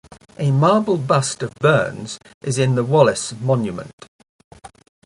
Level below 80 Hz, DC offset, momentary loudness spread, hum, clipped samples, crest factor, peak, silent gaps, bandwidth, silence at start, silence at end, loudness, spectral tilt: -56 dBFS; under 0.1%; 15 LU; none; under 0.1%; 20 dB; 0 dBFS; 2.34-2.41 s, 3.93-3.98 s, 4.08-4.19 s, 4.29-4.51 s; 11.5 kHz; 0.4 s; 0.4 s; -18 LUFS; -5.5 dB/octave